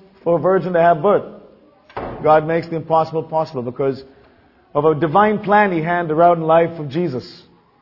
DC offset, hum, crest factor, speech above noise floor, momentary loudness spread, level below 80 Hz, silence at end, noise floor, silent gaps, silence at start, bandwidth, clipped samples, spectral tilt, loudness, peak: under 0.1%; none; 16 dB; 35 dB; 10 LU; -54 dBFS; 0.45 s; -52 dBFS; none; 0.25 s; 6 kHz; under 0.1%; -9 dB/octave; -17 LUFS; 0 dBFS